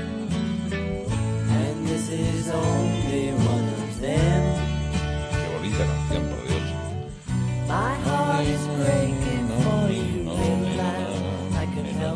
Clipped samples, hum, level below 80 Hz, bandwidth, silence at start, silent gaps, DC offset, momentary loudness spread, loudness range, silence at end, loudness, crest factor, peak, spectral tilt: under 0.1%; none; -36 dBFS; 11 kHz; 0 s; none; under 0.1%; 5 LU; 2 LU; 0 s; -25 LUFS; 16 dB; -8 dBFS; -6.5 dB/octave